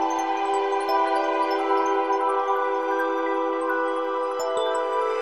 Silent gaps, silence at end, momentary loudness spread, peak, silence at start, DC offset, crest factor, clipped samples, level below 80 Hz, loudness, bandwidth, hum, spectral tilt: none; 0 s; 3 LU; -10 dBFS; 0 s; 0.2%; 12 dB; under 0.1%; -74 dBFS; -24 LUFS; 13.5 kHz; none; -2 dB/octave